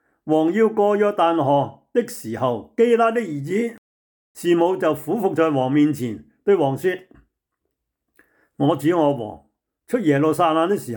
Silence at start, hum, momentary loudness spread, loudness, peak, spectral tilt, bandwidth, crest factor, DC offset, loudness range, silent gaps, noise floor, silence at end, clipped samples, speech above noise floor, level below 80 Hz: 0.25 s; none; 9 LU; -20 LUFS; -6 dBFS; -6.5 dB/octave; 19.5 kHz; 14 dB; under 0.1%; 4 LU; 3.78-4.35 s; -78 dBFS; 0 s; under 0.1%; 59 dB; -66 dBFS